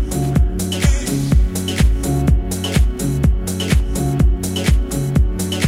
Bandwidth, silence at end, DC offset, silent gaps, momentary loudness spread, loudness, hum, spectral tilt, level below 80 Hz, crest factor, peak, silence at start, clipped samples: 16 kHz; 0 s; under 0.1%; none; 2 LU; -18 LUFS; none; -5.5 dB/octave; -18 dBFS; 14 dB; -2 dBFS; 0 s; under 0.1%